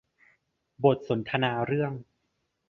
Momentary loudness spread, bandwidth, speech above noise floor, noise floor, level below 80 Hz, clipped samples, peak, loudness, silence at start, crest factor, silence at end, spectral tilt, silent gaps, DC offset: 7 LU; 6 kHz; 51 dB; -77 dBFS; -64 dBFS; under 0.1%; -8 dBFS; -27 LUFS; 0.8 s; 22 dB; 0.7 s; -8.5 dB/octave; none; under 0.1%